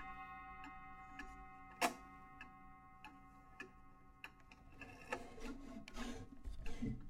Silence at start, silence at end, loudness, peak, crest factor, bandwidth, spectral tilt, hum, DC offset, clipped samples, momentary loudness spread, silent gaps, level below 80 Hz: 0 s; 0 s; -51 LUFS; -24 dBFS; 26 dB; 16 kHz; -4 dB/octave; none; under 0.1%; under 0.1%; 18 LU; none; -56 dBFS